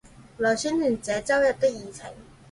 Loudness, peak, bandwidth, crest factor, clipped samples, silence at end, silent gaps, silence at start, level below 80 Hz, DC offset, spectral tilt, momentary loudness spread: -24 LUFS; -10 dBFS; 11.5 kHz; 16 dB; under 0.1%; 0.3 s; none; 0.05 s; -56 dBFS; under 0.1%; -4 dB/octave; 18 LU